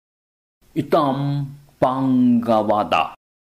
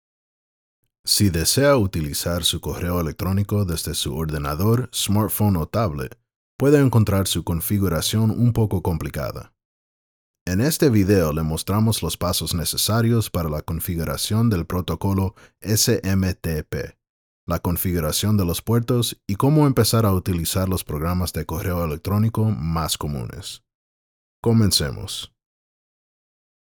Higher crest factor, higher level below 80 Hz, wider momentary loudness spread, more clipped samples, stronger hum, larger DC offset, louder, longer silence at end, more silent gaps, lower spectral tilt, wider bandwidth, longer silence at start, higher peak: about the same, 14 dB vs 18 dB; second, -58 dBFS vs -42 dBFS; about the same, 11 LU vs 11 LU; neither; neither; neither; about the same, -20 LUFS vs -21 LUFS; second, 0.45 s vs 1.35 s; second, none vs 6.36-6.59 s, 9.65-10.34 s, 10.41-10.46 s, 17.09-17.47 s, 23.75-24.43 s; first, -8 dB/octave vs -5 dB/octave; second, 13.5 kHz vs over 20 kHz; second, 0.75 s vs 1.05 s; about the same, -6 dBFS vs -4 dBFS